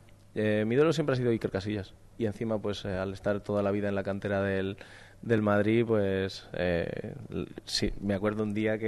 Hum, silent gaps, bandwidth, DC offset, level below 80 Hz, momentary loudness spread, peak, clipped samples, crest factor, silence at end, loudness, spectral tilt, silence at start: none; none; 12 kHz; under 0.1%; -52 dBFS; 12 LU; -14 dBFS; under 0.1%; 16 dB; 0 s; -30 LUFS; -6.5 dB/octave; 0.35 s